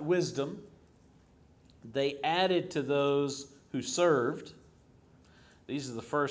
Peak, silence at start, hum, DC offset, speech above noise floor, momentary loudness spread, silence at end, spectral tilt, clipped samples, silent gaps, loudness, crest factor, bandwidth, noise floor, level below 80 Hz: -14 dBFS; 0 s; none; under 0.1%; 31 dB; 13 LU; 0 s; -4.5 dB/octave; under 0.1%; none; -31 LUFS; 18 dB; 8 kHz; -61 dBFS; -68 dBFS